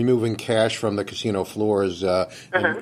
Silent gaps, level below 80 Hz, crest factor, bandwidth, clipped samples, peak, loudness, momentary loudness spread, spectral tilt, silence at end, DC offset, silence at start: none; -60 dBFS; 16 dB; 14.5 kHz; under 0.1%; -6 dBFS; -23 LUFS; 4 LU; -5.5 dB/octave; 0 s; under 0.1%; 0 s